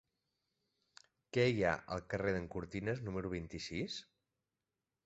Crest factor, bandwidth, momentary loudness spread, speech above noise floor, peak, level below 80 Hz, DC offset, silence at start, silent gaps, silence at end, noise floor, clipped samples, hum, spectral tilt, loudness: 22 dB; 8 kHz; 10 LU; over 52 dB; -18 dBFS; -60 dBFS; under 0.1%; 1.35 s; none; 1.05 s; under -90 dBFS; under 0.1%; none; -5 dB/octave; -39 LUFS